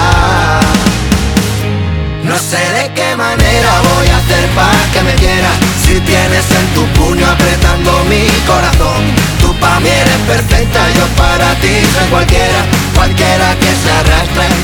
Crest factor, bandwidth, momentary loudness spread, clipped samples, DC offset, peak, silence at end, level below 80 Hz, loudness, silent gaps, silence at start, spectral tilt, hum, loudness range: 8 dB; over 20 kHz; 4 LU; 0.5%; under 0.1%; 0 dBFS; 0 s; -16 dBFS; -9 LUFS; none; 0 s; -4.5 dB/octave; none; 2 LU